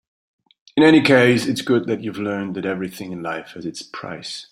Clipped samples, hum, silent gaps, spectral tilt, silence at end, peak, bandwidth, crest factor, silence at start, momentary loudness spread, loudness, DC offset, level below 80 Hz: under 0.1%; none; none; -5.5 dB/octave; 0.05 s; -2 dBFS; 15.5 kHz; 18 dB; 0.75 s; 18 LU; -18 LUFS; under 0.1%; -60 dBFS